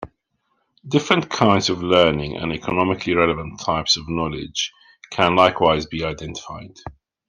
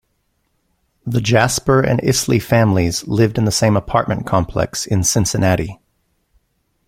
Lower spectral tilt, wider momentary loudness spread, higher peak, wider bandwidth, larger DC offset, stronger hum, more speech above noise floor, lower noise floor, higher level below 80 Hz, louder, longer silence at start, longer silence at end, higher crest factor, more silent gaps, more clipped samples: about the same, -4.5 dB/octave vs -5 dB/octave; first, 17 LU vs 6 LU; about the same, -2 dBFS vs 0 dBFS; second, 10.5 kHz vs 16.5 kHz; neither; neither; about the same, 51 dB vs 51 dB; first, -70 dBFS vs -66 dBFS; second, -46 dBFS vs -40 dBFS; second, -19 LUFS vs -16 LUFS; second, 0 s vs 1.05 s; second, 0.35 s vs 1.1 s; about the same, 20 dB vs 18 dB; neither; neither